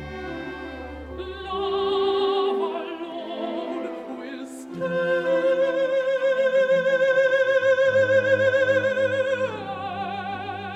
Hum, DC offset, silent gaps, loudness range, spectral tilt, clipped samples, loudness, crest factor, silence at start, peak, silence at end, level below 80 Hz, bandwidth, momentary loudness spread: none; under 0.1%; none; 7 LU; -5 dB/octave; under 0.1%; -23 LUFS; 14 dB; 0 s; -8 dBFS; 0 s; -52 dBFS; 9 kHz; 15 LU